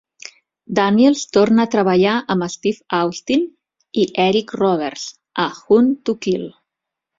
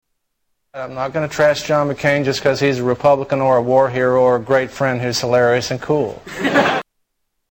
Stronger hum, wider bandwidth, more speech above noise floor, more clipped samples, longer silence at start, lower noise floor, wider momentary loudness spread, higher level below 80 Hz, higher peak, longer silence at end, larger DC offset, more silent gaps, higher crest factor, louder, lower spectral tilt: neither; second, 7.8 kHz vs 17 kHz; first, 66 dB vs 54 dB; neither; about the same, 0.7 s vs 0.75 s; first, -82 dBFS vs -70 dBFS; first, 12 LU vs 8 LU; second, -58 dBFS vs -50 dBFS; about the same, -2 dBFS vs -2 dBFS; about the same, 0.7 s vs 0.7 s; neither; neither; about the same, 16 dB vs 14 dB; about the same, -17 LUFS vs -17 LUFS; about the same, -5.5 dB/octave vs -5 dB/octave